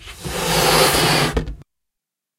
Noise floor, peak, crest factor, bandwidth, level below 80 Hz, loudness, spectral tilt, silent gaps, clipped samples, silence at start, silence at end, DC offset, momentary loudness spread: -83 dBFS; -2 dBFS; 18 dB; 16 kHz; -34 dBFS; -16 LUFS; -3 dB/octave; none; under 0.1%; 0 s; 0.75 s; under 0.1%; 14 LU